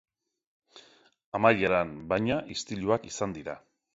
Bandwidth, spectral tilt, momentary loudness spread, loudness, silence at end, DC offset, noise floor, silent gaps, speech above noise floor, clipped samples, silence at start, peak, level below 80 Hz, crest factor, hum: 8 kHz; -5 dB/octave; 15 LU; -28 LUFS; 0.35 s; under 0.1%; -59 dBFS; 1.24-1.32 s; 31 dB; under 0.1%; 0.75 s; -8 dBFS; -58 dBFS; 24 dB; none